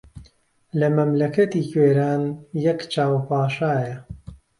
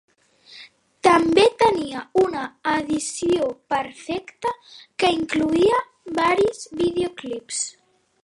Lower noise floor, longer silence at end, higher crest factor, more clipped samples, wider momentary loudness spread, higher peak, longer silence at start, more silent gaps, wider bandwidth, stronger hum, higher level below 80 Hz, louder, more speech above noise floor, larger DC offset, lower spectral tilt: first, -57 dBFS vs -50 dBFS; second, 0.25 s vs 0.55 s; about the same, 16 dB vs 20 dB; neither; about the same, 12 LU vs 12 LU; second, -6 dBFS vs -2 dBFS; second, 0.15 s vs 0.5 s; neither; about the same, 11.5 kHz vs 11.5 kHz; neither; about the same, -54 dBFS vs -56 dBFS; about the same, -21 LUFS vs -21 LUFS; first, 37 dB vs 28 dB; neither; first, -8 dB/octave vs -3.5 dB/octave